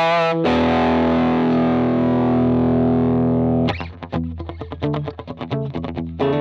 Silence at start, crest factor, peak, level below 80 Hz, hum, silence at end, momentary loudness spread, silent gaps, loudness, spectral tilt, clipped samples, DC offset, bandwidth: 0 s; 12 dB; -6 dBFS; -40 dBFS; none; 0 s; 11 LU; none; -19 LUFS; -8.5 dB/octave; under 0.1%; under 0.1%; 6.4 kHz